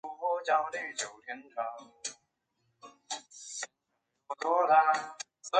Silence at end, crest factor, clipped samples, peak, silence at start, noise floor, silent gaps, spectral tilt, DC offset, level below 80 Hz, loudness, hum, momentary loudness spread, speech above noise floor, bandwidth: 0 s; 22 dB; under 0.1%; -12 dBFS; 0.05 s; -82 dBFS; none; -0.5 dB/octave; under 0.1%; -86 dBFS; -32 LUFS; none; 18 LU; 51 dB; 9.4 kHz